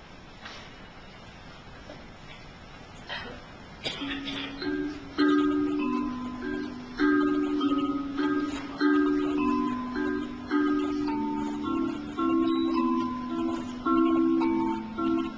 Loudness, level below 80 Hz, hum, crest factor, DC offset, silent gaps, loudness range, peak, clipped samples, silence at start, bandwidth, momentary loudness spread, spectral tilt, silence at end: -28 LUFS; -52 dBFS; none; 16 dB; under 0.1%; none; 12 LU; -12 dBFS; under 0.1%; 0 s; 8 kHz; 21 LU; -6 dB/octave; 0 s